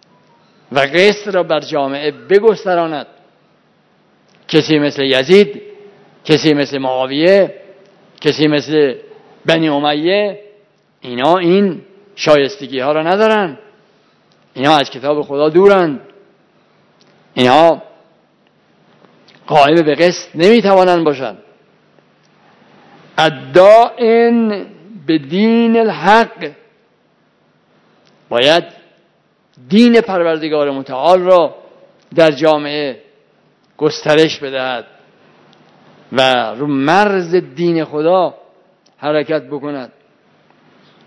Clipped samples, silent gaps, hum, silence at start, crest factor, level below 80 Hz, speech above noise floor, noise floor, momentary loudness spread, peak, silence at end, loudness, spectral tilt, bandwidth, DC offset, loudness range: 0.5%; none; none; 0.7 s; 14 dB; -58 dBFS; 44 dB; -56 dBFS; 13 LU; 0 dBFS; 1.2 s; -13 LUFS; -5.5 dB/octave; 11 kHz; under 0.1%; 4 LU